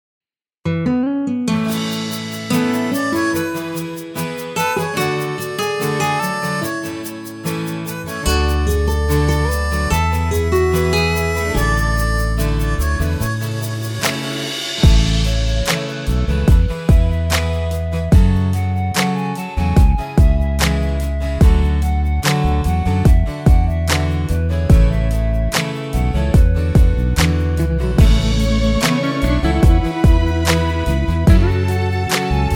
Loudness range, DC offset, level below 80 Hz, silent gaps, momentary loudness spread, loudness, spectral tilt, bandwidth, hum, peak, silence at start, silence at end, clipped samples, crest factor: 5 LU; under 0.1%; -18 dBFS; none; 8 LU; -17 LUFS; -5.5 dB/octave; over 20 kHz; none; 0 dBFS; 0.65 s; 0 s; under 0.1%; 16 dB